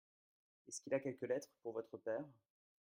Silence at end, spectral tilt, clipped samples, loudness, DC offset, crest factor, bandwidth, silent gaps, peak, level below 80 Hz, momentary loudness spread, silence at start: 0.5 s; -5 dB/octave; under 0.1%; -45 LUFS; under 0.1%; 20 dB; 16 kHz; none; -26 dBFS; under -90 dBFS; 10 LU; 0.65 s